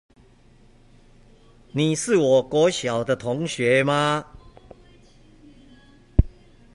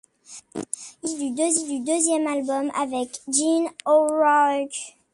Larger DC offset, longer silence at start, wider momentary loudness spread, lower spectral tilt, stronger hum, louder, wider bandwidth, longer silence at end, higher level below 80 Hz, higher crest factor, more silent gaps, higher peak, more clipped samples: neither; first, 1.75 s vs 0.3 s; second, 8 LU vs 15 LU; first, -5 dB/octave vs -2 dB/octave; neither; about the same, -22 LUFS vs -23 LUFS; about the same, 11.5 kHz vs 11.5 kHz; first, 0.45 s vs 0.25 s; first, -36 dBFS vs -70 dBFS; first, 22 dB vs 16 dB; neither; first, -2 dBFS vs -6 dBFS; neither